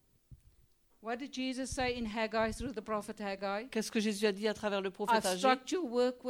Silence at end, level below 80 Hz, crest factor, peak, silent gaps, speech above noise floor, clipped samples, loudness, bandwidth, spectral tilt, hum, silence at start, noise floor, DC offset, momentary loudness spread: 0 s; -58 dBFS; 20 dB; -16 dBFS; none; 33 dB; under 0.1%; -34 LUFS; over 20 kHz; -4 dB/octave; none; 0.3 s; -68 dBFS; under 0.1%; 10 LU